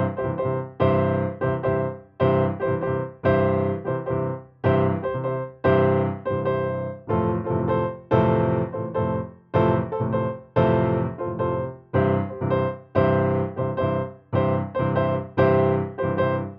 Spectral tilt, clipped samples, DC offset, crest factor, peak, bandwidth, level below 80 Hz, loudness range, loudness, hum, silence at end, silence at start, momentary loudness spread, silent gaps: -10.5 dB/octave; under 0.1%; under 0.1%; 16 dB; -6 dBFS; 5.2 kHz; -48 dBFS; 1 LU; -23 LUFS; none; 0 s; 0 s; 7 LU; none